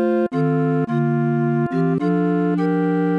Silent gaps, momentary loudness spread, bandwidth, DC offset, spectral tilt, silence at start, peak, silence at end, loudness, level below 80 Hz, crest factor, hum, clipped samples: none; 1 LU; 5.2 kHz; under 0.1%; -10 dB/octave; 0 s; -8 dBFS; 0 s; -19 LUFS; -62 dBFS; 10 dB; none; under 0.1%